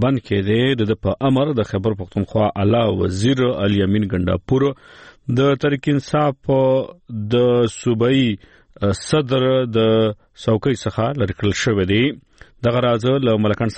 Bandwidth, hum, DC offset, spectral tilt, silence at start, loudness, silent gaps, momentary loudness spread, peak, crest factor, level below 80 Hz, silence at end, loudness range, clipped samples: 8.8 kHz; none; under 0.1%; -6.5 dB/octave; 0 s; -18 LUFS; none; 6 LU; -6 dBFS; 12 dB; -46 dBFS; 0 s; 1 LU; under 0.1%